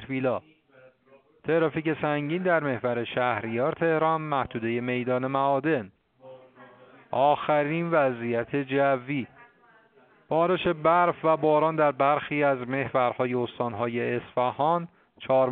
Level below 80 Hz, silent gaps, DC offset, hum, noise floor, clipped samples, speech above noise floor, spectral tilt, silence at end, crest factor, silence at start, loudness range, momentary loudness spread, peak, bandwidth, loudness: -64 dBFS; none; under 0.1%; none; -59 dBFS; under 0.1%; 34 dB; -5 dB/octave; 0 s; 18 dB; 0 s; 4 LU; 7 LU; -8 dBFS; 4.4 kHz; -26 LUFS